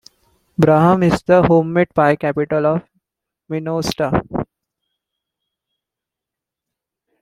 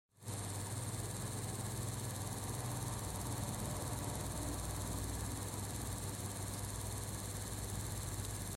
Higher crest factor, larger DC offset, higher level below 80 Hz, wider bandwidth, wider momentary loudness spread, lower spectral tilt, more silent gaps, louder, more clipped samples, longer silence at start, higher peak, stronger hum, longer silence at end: about the same, 16 dB vs 16 dB; neither; first, -46 dBFS vs -52 dBFS; about the same, 15 kHz vs 16.5 kHz; first, 14 LU vs 2 LU; first, -7 dB/octave vs -4 dB/octave; neither; first, -16 LUFS vs -42 LUFS; neither; first, 0.6 s vs 0.2 s; first, -2 dBFS vs -26 dBFS; neither; first, 2.75 s vs 0 s